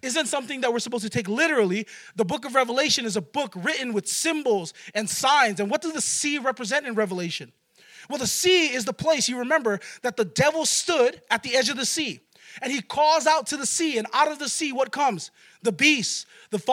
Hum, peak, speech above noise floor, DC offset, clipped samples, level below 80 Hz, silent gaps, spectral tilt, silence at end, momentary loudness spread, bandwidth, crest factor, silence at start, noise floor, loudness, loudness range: none; -6 dBFS; 26 dB; under 0.1%; under 0.1%; -68 dBFS; none; -2.5 dB/octave; 0 s; 10 LU; 17 kHz; 20 dB; 0.05 s; -51 dBFS; -23 LUFS; 2 LU